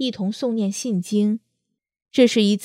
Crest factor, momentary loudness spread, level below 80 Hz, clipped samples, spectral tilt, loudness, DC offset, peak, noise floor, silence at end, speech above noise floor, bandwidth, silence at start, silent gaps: 20 dB; 9 LU; -74 dBFS; under 0.1%; -5 dB/octave; -21 LUFS; under 0.1%; -2 dBFS; -78 dBFS; 0 s; 58 dB; 14.5 kHz; 0 s; none